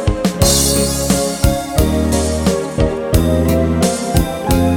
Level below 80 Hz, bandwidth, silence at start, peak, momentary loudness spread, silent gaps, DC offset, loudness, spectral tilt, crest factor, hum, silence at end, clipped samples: -22 dBFS; 17.5 kHz; 0 s; 0 dBFS; 5 LU; none; under 0.1%; -15 LUFS; -5 dB/octave; 14 dB; none; 0 s; under 0.1%